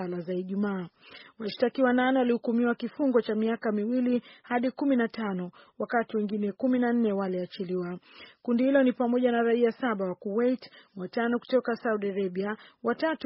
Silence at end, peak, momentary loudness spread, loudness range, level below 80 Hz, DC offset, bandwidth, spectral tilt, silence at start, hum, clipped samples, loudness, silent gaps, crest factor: 0 s; -12 dBFS; 11 LU; 3 LU; -74 dBFS; under 0.1%; 5.8 kHz; -5 dB/octave; 0 s; none; under 0.1%; -28 LUFS; none; 16 dB